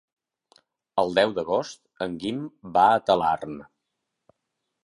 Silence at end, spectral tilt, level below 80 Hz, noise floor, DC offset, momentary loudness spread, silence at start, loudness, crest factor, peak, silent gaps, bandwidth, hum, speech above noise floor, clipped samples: 1.2 s; -5 dB/octave; -62 dBFS; -81 dBFS; under 0.1%; 15 LU; 0.95 s; -24 LUFS; 22 dB; -4 dBFS; none; 11 kHz; none; 57 dB; under 0.1%